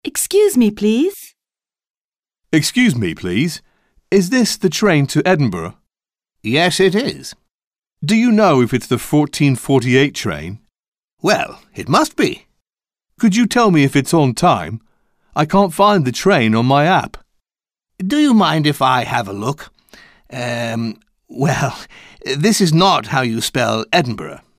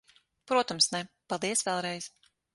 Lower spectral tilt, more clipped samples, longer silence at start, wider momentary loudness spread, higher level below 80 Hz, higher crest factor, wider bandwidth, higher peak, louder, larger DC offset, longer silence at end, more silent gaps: first, -5 dB/octave vs -2 dB/octave; neither; second, 0.05 s vs 0.45 s; first, 14 LU vs 11 LU; first, -48 dBFS vs -74 dBFS; second, 14 dB vs 20 dB; first, 16 kHz vs 12 kHz; first, -2 dBFS vs -12 dBFS; first, -15 LUFS vs -29 LUFS; neither; second, 0.2 s vs 0.45 s; first, 1.90-1.94 s, 2.01-2.09 s, 2.19-2.23 s, 7.67-7.71 s, 10.88-10.92 s, 11.13-11.17 s vs none